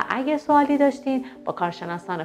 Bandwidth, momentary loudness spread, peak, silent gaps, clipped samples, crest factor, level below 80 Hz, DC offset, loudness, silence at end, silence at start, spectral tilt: 10 kHz; 11 LU; -6 dBFS; none; under 0.1%; 16 dB; -64 dBFS; under 0.1%; -23 LUFS; 0 s; 0 s; -6.5 dB/octave